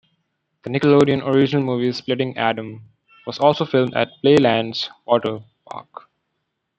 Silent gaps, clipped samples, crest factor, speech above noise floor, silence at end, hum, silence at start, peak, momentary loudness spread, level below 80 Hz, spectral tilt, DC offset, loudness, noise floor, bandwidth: none; under 0.1%; 18 dB; 57 dB; 0.95 s; none; 0.65 s; -2 dBFS; 21 LU; -62 dBFS; -7 dB/octave; under 0.1%; -19 LUFS; -75 dBFS; 8.4 kHz